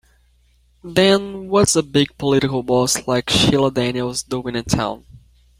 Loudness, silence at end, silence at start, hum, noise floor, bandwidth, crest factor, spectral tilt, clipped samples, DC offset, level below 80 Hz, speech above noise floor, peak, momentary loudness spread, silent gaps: -18 LUFS; 0.45 s; 0.85 s; none; -57 dBFS; 16.5 kHz; 18 dB; -4 dB/octave; under 0.1%; under 0.1%; -44 dBFS; 39 dB; -2 dBFS; 9 LU; none